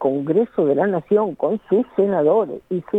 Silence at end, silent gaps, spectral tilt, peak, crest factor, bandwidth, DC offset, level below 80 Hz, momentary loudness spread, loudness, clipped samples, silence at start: 0 s; none; -10 dB/octave; -6 dBFS; 14 dB; 3.9 kHz; under 0.1%; -64 dBFS; 5 LU; -19 LUFS; under 0.1%; 0 s